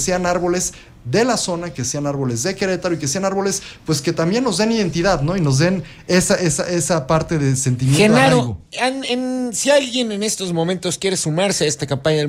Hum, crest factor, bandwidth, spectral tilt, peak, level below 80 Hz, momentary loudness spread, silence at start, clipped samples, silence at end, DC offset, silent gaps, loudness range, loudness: none; 16 dB; 16 kHz; -4.5 dB/octave; -2 dBFS; -44 dBFS; 6 LU; 0 s; under 0.1%; 0 s; under 0.1%; none; 4 LU; -18 LUFS